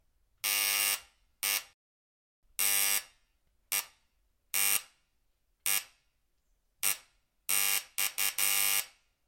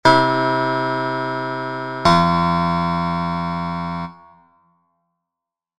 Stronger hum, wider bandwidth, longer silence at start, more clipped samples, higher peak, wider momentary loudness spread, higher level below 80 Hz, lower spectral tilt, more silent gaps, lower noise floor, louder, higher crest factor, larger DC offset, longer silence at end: neither; first, 17 kHz vs 9.8 kHz; first, 0.45 s vs 0.05 s; neither; second, -10 dBFS vs 0 dBFS; about the same, 9 LU vs 11 LU; second, -76 dBFS vs -46 dBFS; second, 3 dB/octave vs -6 dB/octave; first, 1.74-2.42 s vs none; second, -75 dBFS vs -86 dBFS; second, -29 LUFS vs -19 LUFS; about the same, 24 dB vs 20 dB; second, under 0.1% vs 0.4%; second, 0.4 s vs 1.65 s